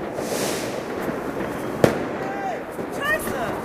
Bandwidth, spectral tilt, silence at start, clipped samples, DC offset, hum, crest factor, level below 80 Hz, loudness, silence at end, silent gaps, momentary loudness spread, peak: 15.5 kHz; -4.5 dB/octave; 0 s; under 0.1%; under 0.1%; none; 26 dB; -50 dBFS; -25 LUFS; 0 s; none; 7 LU; 0 dBFS